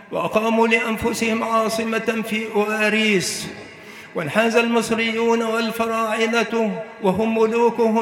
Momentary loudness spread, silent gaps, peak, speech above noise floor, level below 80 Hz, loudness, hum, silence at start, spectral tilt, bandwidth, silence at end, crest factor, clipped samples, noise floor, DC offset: 8 LU; none; -2 dBFS; 20 dB; -56 dBFS; -20 LUFS; none; 0 s; -4 dB/octave; 17 kHz; 0 s; 18 dB; under 0.1%; -40 dBFS; under 0.1%